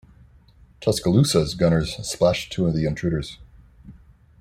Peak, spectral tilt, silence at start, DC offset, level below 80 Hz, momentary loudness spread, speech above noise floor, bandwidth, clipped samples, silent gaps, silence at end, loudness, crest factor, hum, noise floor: -4 dBFS; -5.5 dB/octave; 0.8 s; under 0.1%; -44 dBFS; 9 LU; 31 dB; 14.5 kHz; under 0.1%; none; 0.5 s; -22 LUFS; 18 dB; none; -52 dBFS